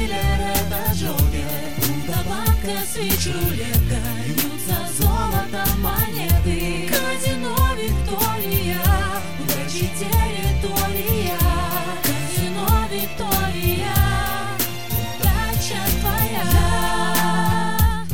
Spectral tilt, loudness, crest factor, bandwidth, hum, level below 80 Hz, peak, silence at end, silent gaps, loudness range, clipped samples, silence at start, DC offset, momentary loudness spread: -4.5 dB/octave; -21 LUFS; 16 dB; 17.5 kHz; none; -26 dBFS; -4 dBFS; 0 s; none; 1 LU; under 0.1%; 0 s; 4%; 4 LU